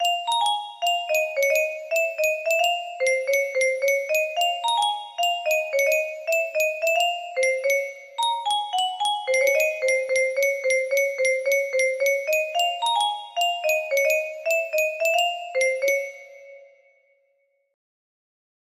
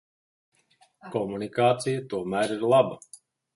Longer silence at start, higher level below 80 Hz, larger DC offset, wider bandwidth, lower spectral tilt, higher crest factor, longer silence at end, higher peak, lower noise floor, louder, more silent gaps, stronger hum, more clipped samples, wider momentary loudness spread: second, 0 s vs 1.05 s; second, -76 dBFS vs -66 dBFS; neither; first, 15.5 kHz vs 11.5 kHz; second, 2.5 dB/octave vs -5.5 dB/octave; second, 14 dB vs 22 dB; first, 2.15 s vs 0.4 s; second, -10 dBFS vs -6 dBFS; first, -69 dBFS vs -64 dBFS; first, -22 LUFS vs -26 LUFS; neither; neither; neither; second, 3 LU vs 10 LU